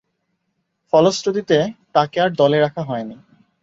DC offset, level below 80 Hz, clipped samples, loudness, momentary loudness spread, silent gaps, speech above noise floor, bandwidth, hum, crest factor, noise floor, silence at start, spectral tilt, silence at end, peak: under 0.1%; -62 dBFS; under 0.1%; -18 LUFS; 11 LU; none; 55 dB; 8 kHz; none; 18 dB; -72 dBFS; 0.95 s; -5.5 dB/octave; 0.5 s; -2 dBFS